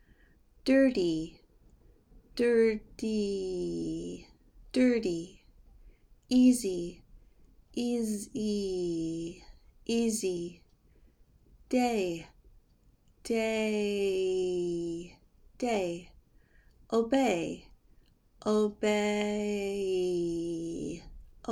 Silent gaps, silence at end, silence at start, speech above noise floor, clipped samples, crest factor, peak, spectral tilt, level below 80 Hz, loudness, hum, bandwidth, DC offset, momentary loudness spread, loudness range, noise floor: none; 0 s; 0.65 s; 35 dB; under 0.1%; 18 dB; -14 dBFS; -5 dB/octave; -58 dBFS; -31 LUFS; none; 16 kHz; under 0.1%; 17 LU; 4 LU; -64 dBFS